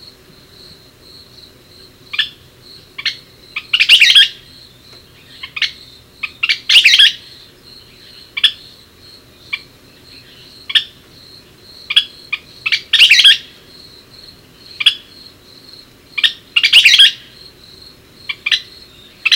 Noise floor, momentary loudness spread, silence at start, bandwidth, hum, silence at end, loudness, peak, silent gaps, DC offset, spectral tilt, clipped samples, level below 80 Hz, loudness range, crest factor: -43 dBFS; 23 LU; 2.15 s; over 20 kHz; none; 0 s; -10 LUFS; 0 dBFS; none; under 0.1%; 2 dB/octave; 0.2%; -56 dBFS; 11 LU; 16 dB